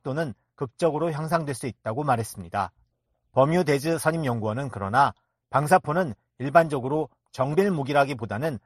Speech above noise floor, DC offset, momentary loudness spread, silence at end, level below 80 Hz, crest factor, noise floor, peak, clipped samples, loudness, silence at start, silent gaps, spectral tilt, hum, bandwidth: 49 dB; under 0.1%; 10 LU; 0.1 s; -60 dBFS; 22 dB; -74 dBFS; -4 dBFS; under 0.1%; -25 LUFS; 0.05 s; none; -6.5 dB/octave; none; 13.5 kHz